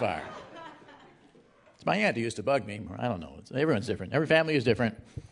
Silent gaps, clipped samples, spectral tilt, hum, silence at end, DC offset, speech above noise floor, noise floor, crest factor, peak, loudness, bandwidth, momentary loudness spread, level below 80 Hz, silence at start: none; under 0.1%; -6 dB/octave; none; 0.05 s; under 0.1%; 31 dB; -59 dBFS; 22 dB; -10 dBFS; -29 LUFS; 11 kHz; 20 LU; -62 dBFS; 0 s